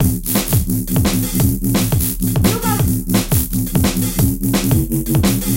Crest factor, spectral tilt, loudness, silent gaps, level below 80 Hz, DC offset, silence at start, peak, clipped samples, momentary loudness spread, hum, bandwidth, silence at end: 14 dB; -5 dB/octave; -16 LUFS; none; -26 dBFS; under 0.1%; 0 s; -2 dBFS; under 0.1%; 2 LU; none; 17.5 kHz; 0 s